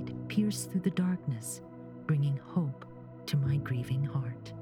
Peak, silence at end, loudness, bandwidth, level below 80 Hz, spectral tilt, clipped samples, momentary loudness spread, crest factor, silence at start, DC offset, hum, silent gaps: -18 dBFS; 0 s; -33 LUFS; 16.5 kHz; -62 dBFS; -6.5 dB/octave; under 0.1%; 12 LU; 14 dB; 0 s; under 0.1%; none; none